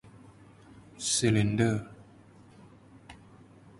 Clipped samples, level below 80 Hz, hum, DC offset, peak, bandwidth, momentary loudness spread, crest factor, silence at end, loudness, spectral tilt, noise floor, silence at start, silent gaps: under 0.1%; -58 dBFS; none; under 0.1%; -12 dBFS; 11.5 kHz; 27 LU; 20 dB; 0.65 s; -28 LUFS; -4.5 dB/octave; -55 dBFS; 0.25 s; none